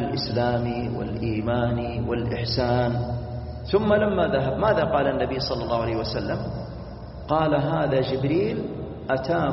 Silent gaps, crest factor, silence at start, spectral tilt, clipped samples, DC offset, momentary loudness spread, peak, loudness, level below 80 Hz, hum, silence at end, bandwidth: none; 16 dB; 0 s; -5.5 dB/octave; under 0.1%; under 0.1%; 11 LU; -8 dBFS; -25 LUFS; -40 dBFS; none; 0 s; 6 kHz